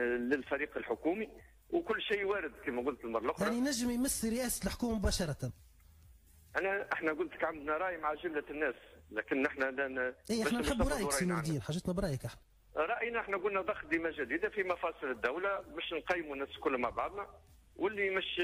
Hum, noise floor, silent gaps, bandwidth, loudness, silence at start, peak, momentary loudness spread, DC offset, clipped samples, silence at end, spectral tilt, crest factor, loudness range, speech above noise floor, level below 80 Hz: none; -61 dBFS; none; 15.5 kHz; -36 LUFS; 0 s; -20 dBFS; 6 LU; under 0.1%; under 0.1%; 0 s; -4.5 dB/octave; 16 dB; 2 LU; 25 dB; -52 dBFS